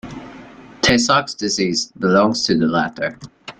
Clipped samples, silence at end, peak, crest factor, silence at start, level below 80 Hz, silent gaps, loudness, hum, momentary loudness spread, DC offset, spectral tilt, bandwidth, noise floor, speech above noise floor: under 0.1%; 0.1 s; 0 dBFS; 18 dB; 0.05 s; -46 dBFS; none; -17 LUFS; none; 19 LU; under 0.1%; -4 dB/octave; 11 kHz; -40 dBFS; 22 dB